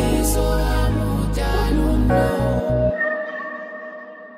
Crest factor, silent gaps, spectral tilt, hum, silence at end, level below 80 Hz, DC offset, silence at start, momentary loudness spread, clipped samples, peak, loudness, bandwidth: 14 dB; none; -6 dB/octave; none; 0 s; -24 dBFS; under 0.1%; 0 s; 13 LU; under 0.1%; -4 dBFS; -20 LUFS; 16 kHz